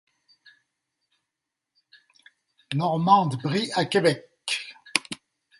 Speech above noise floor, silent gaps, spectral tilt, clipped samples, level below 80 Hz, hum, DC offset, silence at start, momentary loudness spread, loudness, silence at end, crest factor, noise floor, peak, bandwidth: 63 dB; none; -4.5 dB/octave; under 0.1%; -70 dBFS; none; under 0.1%; 2.7 s; 12 LU; -24 LUFS; 0.45 s; 28 dB; -85 dBFS; 0 dBFS; 12 kHz